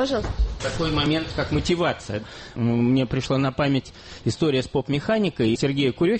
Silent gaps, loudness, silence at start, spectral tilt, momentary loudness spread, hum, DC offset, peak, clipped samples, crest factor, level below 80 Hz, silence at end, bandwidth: none; -23 LUFS; 0 s; -6 dB/octave; 8 LU; none; under 0.1%; -10 dBFS; under 0.1%; 14 dB; -36 dBFS; 0 s; 8.8 kHz